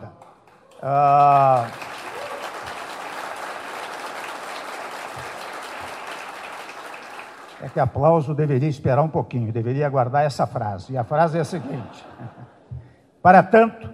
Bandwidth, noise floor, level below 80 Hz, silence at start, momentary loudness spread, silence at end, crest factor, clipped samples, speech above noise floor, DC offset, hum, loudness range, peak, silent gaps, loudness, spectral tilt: 14.5 kHz; -51 dBFS; -58 dBFS; 0 s; 21 LU; 0 s; 22 dB; under 0.1%; 32 dB; under 0.1%; none; 11 LU; 0 dBFS; none; -21 LUFS; -7 dB/octave